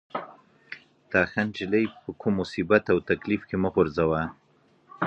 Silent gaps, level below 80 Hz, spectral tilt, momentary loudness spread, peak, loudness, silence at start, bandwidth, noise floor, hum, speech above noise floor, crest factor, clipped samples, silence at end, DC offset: none; -52 dBFS; -7.5 dB/octave; 20 LU; -6 dBFS; -26 LUFS; 0.15 s; 8.2 kHz; -62 dBFS; none; 37 dB; 22 dB; under 0.1%; 0 s; under 0.1%